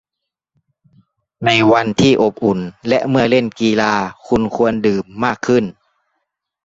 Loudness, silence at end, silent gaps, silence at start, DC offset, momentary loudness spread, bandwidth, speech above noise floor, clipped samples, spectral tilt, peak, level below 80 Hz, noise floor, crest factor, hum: -15 LUFS; 0.95 s; none; 1.4 s; under 0.1%; 7 LU; 8 kHz; 66 dB; under 0.1%; -5.5 dB/octave; -2 dBFS; -48 dBFS; -81 dBFS; 16 dB; none